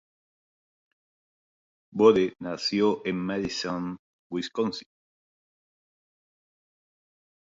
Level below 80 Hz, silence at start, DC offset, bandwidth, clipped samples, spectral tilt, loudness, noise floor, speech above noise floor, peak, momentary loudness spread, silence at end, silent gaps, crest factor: -64 dBFS; 1.95 s; under 0.1%; 7.8 kHz; under 0.1%; -5.5 dB/octave; -26 LUFS; under -90 dBFS; over 64 dB; -6 dBFS; 16 LU; 2.7 s; 3.99-4.30 s; 24 dB